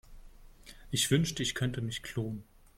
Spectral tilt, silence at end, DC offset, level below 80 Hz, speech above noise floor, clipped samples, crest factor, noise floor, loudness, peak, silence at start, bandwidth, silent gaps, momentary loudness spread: -4 dB/octave; 0.35 s; under 0.1%; -54 dBFS; 21 dB; under 0.1%; 20 dB; -53 dBFS; -32 LUFS; -14 dBFS; 0.1 s; 16.5 kHz; none; 10 LU